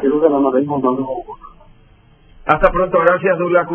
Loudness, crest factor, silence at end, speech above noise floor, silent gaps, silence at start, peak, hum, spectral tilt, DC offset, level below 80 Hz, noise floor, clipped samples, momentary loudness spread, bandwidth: -15 LUFS; 16 dB; 0 s; 33 dB; none; 0 s; 0 dBFS; none; -10.5 dB/octave; under 0.1%; -38 dBFS; -48 dBFS; under 0.1%; 13 LU; 4 kHz